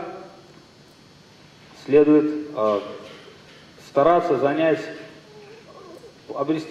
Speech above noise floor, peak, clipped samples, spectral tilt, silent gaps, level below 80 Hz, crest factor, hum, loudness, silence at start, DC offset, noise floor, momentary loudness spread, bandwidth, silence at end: 31 dB; -4 dBFS; under 0.1%; -7 dB/octave; none; -62 dBFS; 20 dB; none; -20 LUFS; 0 s; under 0.1%; -50 dBFS; 25 LU; 9 kHz; 0 s